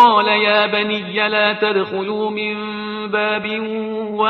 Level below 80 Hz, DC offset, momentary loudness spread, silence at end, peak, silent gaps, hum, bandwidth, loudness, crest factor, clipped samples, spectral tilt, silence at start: -64 dBFS; under 0.1%; 10 LU; 0 s; 0 dBFS; none; none; 5.8 kHz; -18 LUFS; 16 dB; under 0.1%; -6 dB/octave; 0 s